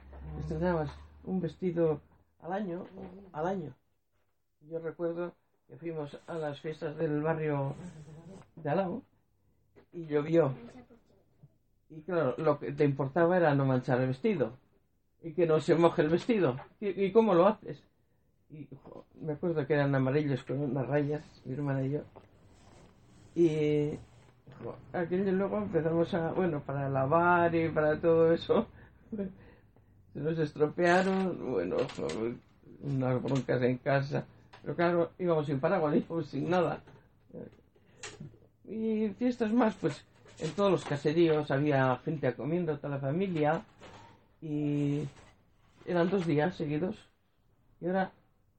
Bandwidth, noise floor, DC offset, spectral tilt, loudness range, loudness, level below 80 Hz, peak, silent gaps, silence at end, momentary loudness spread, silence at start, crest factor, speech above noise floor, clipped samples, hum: 8.8 kHz; -79 dBFS; under 0.1%; -8 dB/octave; 7 LU; -31 LUFS; -60 dBFS; -10 dBFS; none; 0.5 s; 19 LU; 0.05 s; 22 dB; 49 dB; under 0.1%; none